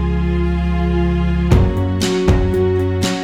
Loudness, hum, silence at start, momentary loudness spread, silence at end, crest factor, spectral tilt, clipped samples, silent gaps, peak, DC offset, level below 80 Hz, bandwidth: -16 LUFS; none; 0 s; 3 LU; 0 s; 14 dB; -6.5 dB/octave; under 0.1%; none; 0 dBFS; under 0.1%; -20 dBFS; 13.5 kHz